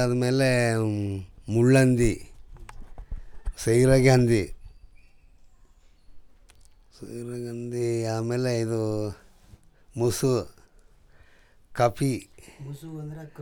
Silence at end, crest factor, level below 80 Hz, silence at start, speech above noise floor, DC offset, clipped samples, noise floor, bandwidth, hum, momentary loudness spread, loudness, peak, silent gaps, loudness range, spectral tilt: 0 s; 20 dB; -44 dBFS; 0 s; 32 dB; under 0.1%; under 0.1%; -55 dBFS; 18 kHz; none; 22 LU; -24 LUFS; -6 dBFS; none; 10 LU; -6.5 dB/octave